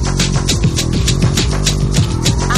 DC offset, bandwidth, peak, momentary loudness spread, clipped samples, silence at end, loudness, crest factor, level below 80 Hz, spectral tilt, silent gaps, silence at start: under 0.1%; 14 kHz; 0 dBFS; 1 LU; under 0.1%; 0 s; -14 LUFS; 12 dB; -20 dBFS; -4.5 dB/octave; none; 0 s